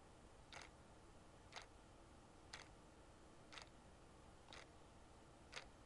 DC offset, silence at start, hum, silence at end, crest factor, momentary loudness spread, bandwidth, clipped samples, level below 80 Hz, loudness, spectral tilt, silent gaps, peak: under 0.1%; 0 s; none; 0 s; 26 dB; 8 LU; 11 kHz; under 0.1%; -70 dBFS; -62 LUFS; -3 dB/octave; none; -36 dBFS